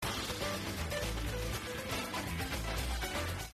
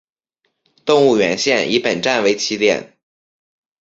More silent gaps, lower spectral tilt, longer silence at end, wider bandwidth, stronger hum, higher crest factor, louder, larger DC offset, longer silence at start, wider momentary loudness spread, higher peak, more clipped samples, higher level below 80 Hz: neither; about the same, -3.5 dB/octave vs -3.5 dB/octave; second, 0 s vs 0.95 s; first, 14 kHz vs 7.8 kHz; neither; about the same, 14 dB vs 16 dB; second, -37 LUFS vs -16 LUFS; neither; second, 0 s vs 0.85 s; about the same, 2 LU vs 4 LU; second, -24 dBFS vs -2 dBFS; neither; first, -44 dBFS vs -60 dBFS